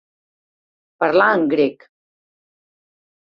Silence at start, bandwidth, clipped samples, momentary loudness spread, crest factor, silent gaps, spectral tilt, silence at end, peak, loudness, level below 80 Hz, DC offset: 1 s; 5.8 kHz; under 0.1%; 7 LU; 20 dB; none; -7.5 dB/octave; 1.5 s; -2 dBFS; -17 LUFS; -68 dBFS; under 0.1%